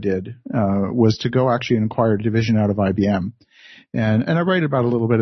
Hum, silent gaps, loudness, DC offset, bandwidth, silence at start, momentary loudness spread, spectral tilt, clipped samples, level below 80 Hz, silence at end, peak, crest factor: none; none; -19 LUFS; under 0.1%; 6.4 kHz; 0 s; 6 LU; -8 dB/octave; under 0.1%; -54 dBFS; 0 s; -4 dBFS; 16 dB